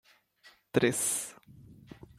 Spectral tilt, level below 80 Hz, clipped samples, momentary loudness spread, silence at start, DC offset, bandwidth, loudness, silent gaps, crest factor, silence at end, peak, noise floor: -3.5 dB/octave; -66 dBFS; under 0.1%; 17 LU; 0.75 s; under 0.1%; 16 kHz; -29 LUFS; none; 24 dB; 0.15 s; -10 dBFS; -62 dBFS